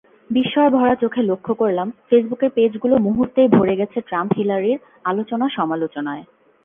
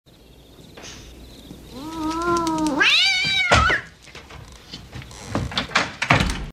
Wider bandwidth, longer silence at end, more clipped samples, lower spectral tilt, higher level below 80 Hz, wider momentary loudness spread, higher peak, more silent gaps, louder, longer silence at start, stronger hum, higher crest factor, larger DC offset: second, 3.7 kHz vs 15.5 kHz; first, 0.4 s vs 0 s; neither; first, -10 dB/octave vs -3.5 dB/octave; second, -56 dBFS vs -36 dBFS; second, 9 LU vs 25 LU; about the same, 0 dBFS vs 0 dBFS; neither; about the same, -19 LUFS vs -19 LUFS; second, 0.3 s vs 0.6 s; neither; second, 18 dB vs 24 dB; neither